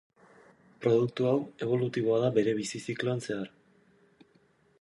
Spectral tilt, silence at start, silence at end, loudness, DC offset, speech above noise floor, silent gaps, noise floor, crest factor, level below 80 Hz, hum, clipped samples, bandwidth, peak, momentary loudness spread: -6.5 dB/octave; 0.8 s; 1.35 s; -29 LUFS; under 0.1%; 37 dB; none; -66 dBFS; 18 dB; -72 dBFS; none; under 0.1%; 11.5 kHz; -12 dBFS; 9 LU